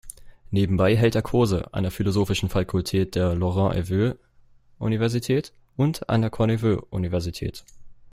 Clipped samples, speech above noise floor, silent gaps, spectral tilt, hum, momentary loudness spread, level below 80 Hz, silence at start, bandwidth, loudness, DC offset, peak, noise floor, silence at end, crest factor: under 0.1%; 32 dB; none; -7 dB/octave; none; 10 LU; -44 dBFS; 0.05 s; 15.5 kHz; -24 LUFS; under 0.1%; -6 dBFS; -54 dBFS; 0.05 s; 18 dB